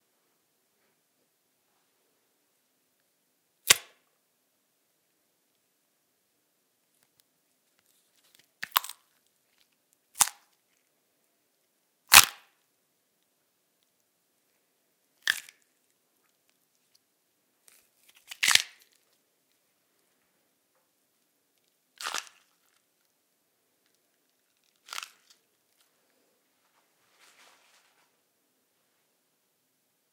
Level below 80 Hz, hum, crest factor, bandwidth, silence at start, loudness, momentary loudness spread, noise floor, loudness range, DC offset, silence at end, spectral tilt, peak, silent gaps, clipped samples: -70 dBFS; none; 36 dB; 17.5 kHz; 3.65 s; -23 LUFS; 25 LU; -75 dBFS; 24 LU; under 0.1%; 7.95 s; 2 dB/octave; 0 dBFS; none; under 0.1%